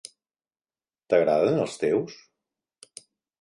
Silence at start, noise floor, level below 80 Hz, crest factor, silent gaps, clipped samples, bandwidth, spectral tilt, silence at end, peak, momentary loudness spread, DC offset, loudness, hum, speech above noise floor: 1.1 s; under -90 dBFS; -68 dBFS; 20 dB; none; under 0.1%; 11.5 kHz; -6 dB/octave; 1.25 s; -8 dBFS; 25 LU; under 0.1%; -24 LUFS; none; over 67 dB